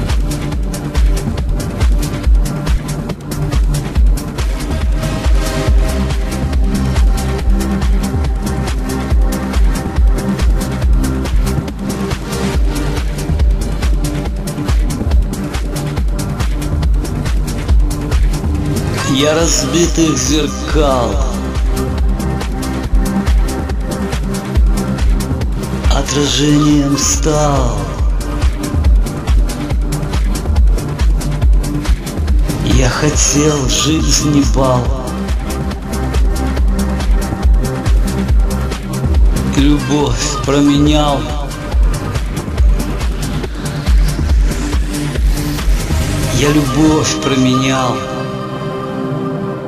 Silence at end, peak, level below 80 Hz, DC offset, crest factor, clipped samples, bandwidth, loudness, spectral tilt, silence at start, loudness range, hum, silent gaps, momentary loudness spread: 0 s; 0 dBFS; -16 dBFS; under 0.1%; 14 dB; under 0.1%; 15 kHz; -15 LUFS; -5 dB/octave; 0 s; 4 LU; none; none; 7 LU